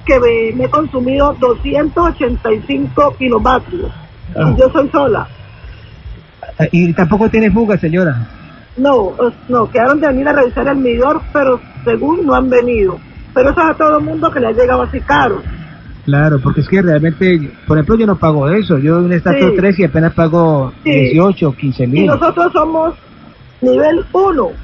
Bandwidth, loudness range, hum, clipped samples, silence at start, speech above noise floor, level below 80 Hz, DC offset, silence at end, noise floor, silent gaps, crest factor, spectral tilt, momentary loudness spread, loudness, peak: 7 kHz; 3 LU; none; under 0.1%; 0 s; 27 dB; -30 dBFS; under 0.1%; 0 s; -38 dBFS; none; 12 dB; -9 dB/octave; 6 LU; -12 LUFS; 0 dBFS